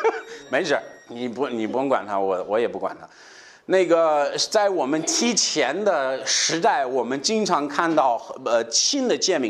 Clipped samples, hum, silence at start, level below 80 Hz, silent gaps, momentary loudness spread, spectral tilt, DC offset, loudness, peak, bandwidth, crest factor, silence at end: under 0.1%; none; 0 s; -72 dBFS; none; 9 LU; -2 dB/octave; under 0.1%; -22 LUFS; -6 dBFS; 13 kHz; 16 dB; 0 s